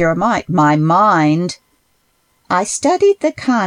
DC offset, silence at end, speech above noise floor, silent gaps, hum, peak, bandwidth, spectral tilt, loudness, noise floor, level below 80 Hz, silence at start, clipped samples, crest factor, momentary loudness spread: under 0.1%; 0 s; 47 dB; none; none; -2 dBFS; 12.5 kHz; -5.5 dB/octave; -14 LUFS; -61 dBFS; -50 dBFS; 0 s; under 0.1%; 12 dB; 7 LU